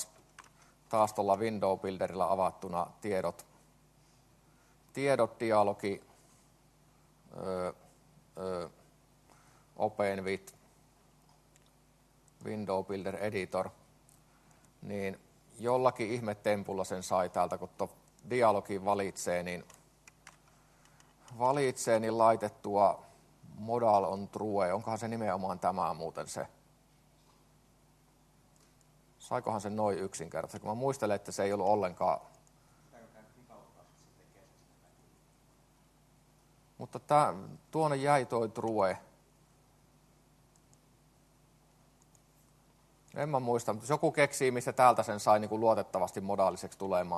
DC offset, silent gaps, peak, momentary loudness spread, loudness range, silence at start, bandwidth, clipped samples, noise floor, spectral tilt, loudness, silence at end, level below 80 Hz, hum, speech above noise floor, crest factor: under 0.1%; none; -10 dBFS; 14 LU; 10 LU; 0 s; 13 kHz; under 0.1%; -66 dBFS; -5.5 dB/octave; -33 LUFS; 0 s; -72 dBFS; none; 34 dB; 24 dB